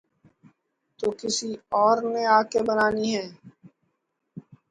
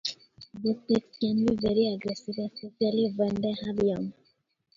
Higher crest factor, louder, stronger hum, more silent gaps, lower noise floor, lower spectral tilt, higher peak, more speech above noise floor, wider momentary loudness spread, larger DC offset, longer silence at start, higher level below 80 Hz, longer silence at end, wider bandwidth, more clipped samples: about the same, 20 dB vs 16 dB; first, -24 LUFS vs -29 LUFS; neither; neither; first, -76 dBFS vs -70 dBFS; second, -3.5 dB/octave vs -6.5 dB/octave; first, -6 dBFS vs -12 dBFS; first, 53 dB vs 42 dB; about the same, 10 LU vs 10 LU; neither; first, 1 s vs 0.05 s; second, -64 dBFS vs -58 dBFS; second, 0.3 s vs 0.65 s; first, 11 kHz vs 7.4 kHz; neither